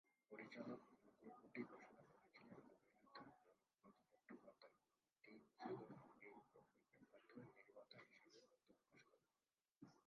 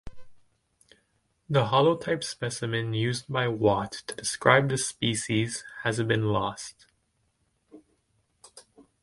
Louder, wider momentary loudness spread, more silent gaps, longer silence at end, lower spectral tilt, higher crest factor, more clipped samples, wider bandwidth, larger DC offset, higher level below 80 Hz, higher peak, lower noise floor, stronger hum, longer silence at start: second, -62 LUFS vs -26 LUFS; about the same, 12 LU vs 10 LU; neither; second, 0.05 s vs 0.2 s; about the same, -4.5 dB/octave vs -4.5 dB/octave; about the same, 24 dB vs 26 dB; neither; second, 6.2 kHz vs 11.5 kHz; neither; second, under -90 dBFS vs -58 dBFS; second, -40 dBFS vs -4 dBFS; first, under -90 dBFS vs -73 dBFS; neither; about the same, 0.05 s vs 0.05 s